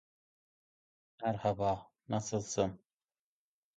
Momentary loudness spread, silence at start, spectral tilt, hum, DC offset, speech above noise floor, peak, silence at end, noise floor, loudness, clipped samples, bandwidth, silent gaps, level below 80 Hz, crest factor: 6 LU; 1.2 s; -5.5 dB/octave; none; under 0.1%; over 56 dB; -18 dBFS; 1 s; under -90 dBFS; -36 LUFS; under 0.1%; 9 kHz; none; -64 dBFS; 22 dB